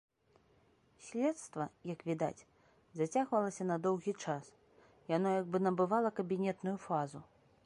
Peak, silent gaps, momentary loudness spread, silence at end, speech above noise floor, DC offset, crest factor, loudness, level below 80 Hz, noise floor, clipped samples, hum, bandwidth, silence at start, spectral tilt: -18 dBFS; none; 11 LU; 0.4 s; 35 dB; under 0.1%; 18 dB; -37 LUFS; -78 dBFS; -70 dBFS; under 0.1%; none; 11.5 kHz; 1 s; -6.5 dB/octave